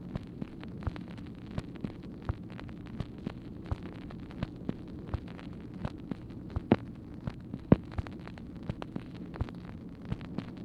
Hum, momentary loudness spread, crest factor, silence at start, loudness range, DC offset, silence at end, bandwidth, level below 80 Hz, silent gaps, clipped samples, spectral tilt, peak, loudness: none; 14 LU; 30 dB; 0 s; 7 LU; under 0.1%; 0 s; 10.5 kHz; -48 dBFS; none; under 0.1%; -9 dB/octave; -6 dBFS; -38 LUFS